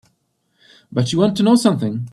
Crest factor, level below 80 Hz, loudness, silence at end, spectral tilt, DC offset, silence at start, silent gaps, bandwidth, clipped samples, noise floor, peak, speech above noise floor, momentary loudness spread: 18 dB; -56 dBFS; -17 LUFS; 0.05 s; -6.5 dB/octave; under 0.1%; 0.9 s; none; 12.5 kHz; under 0.1%; -67 dBFS; 0 dBFS; 51 dB; 8 LU